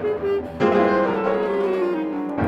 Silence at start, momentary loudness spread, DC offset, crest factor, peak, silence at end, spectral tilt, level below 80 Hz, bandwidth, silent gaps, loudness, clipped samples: 0 s; 7 LU; under 0.1%; 16 dB; -4 dBFS; 0 s; -8 dB/octave; -52 dBFS; 7.8 kHz; none; -21 LUFS; under 0.1%